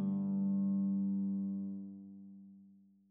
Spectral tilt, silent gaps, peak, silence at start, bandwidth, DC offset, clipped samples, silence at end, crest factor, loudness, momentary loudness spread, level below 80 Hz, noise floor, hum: -16 dB/octave; none; -28 dBFS; 0 s; 1.4 kHz; under 0.1%; under 0.1%; 0.4 s; 10 dB; -36 LUFS; 20 LU; under -90 dBFS; -63 dBFS; none